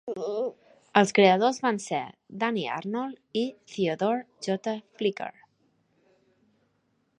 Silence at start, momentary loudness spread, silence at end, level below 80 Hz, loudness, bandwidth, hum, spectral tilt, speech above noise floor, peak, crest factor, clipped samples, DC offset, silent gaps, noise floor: 0.05 s; 13 LU; 1.9 s; -76 dBFS; -27 LUFS; 11 kHz; none; -5 dB/octave; 45 dB; -2 dBFS; 26 dB; under 0.1%; under 0.1%; none; -72 dBFS